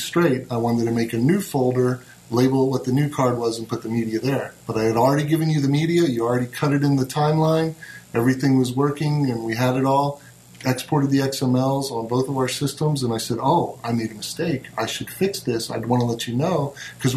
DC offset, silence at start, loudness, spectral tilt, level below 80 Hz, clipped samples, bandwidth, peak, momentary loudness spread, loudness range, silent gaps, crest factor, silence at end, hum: under 0.1%; 0 s; -22 LUFS; -6 dB/octave; -56 dBFS; under 0.1%; 13.5 kHz; -4 dBFS; 7 LU; 3 LU; none; 16 dB; 0 s; none